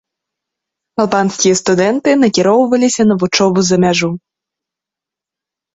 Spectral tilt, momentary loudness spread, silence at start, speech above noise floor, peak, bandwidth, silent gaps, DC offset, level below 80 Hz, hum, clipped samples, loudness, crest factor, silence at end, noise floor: -4.5 dB/octave; 6 LU; 1 s; 74 dB; 0 dBFS; 8 kHz; none; under 0.1%; -52 dBFS; none; under 0.1%; -12 LUFS; 14 dB; 1.55 s; -85 dBFS